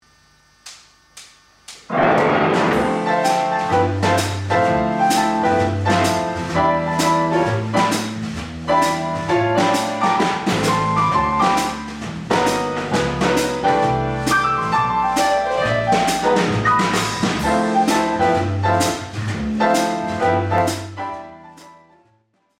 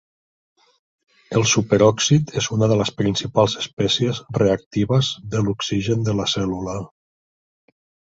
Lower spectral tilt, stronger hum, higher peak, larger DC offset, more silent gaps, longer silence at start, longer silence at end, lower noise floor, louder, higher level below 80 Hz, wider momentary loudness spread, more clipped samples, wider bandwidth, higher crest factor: about the same, -5 dB/octave vs -5 dB/octave; neither; about the same, -4 dBFS vs -2 dBFS; neither; second, none vs 3.73-3.77 s, 4.66-4.71 s; second, 0.65 s vs 1.3 s; second, 0.85 s vs 1.35 s; second, -62 dBFS vs under -90 dBFS; about the same, -18 LUFS vs -20 LUFS; about the same, -44 dBFS vs -48 dBFS; about the same, 6 LU vs 7 LU; neither; first, 16.5 kHz vs 7.8 kHz; about the same, 14 dB vs 18 dB